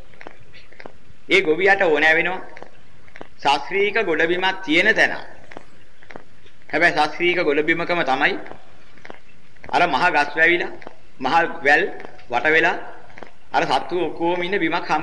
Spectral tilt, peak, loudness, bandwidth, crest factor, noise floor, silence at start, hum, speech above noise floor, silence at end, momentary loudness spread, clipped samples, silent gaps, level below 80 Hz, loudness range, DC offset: -4 dB/octave; -4 dBFS; -18 LUFS; 11.5 kHz; 16 dB; -51 dBFS; 0.55 s; none; 32 dB; 0 s; 11 LU; under 0.1%; none; -58 dBFS; 2 LU; 3%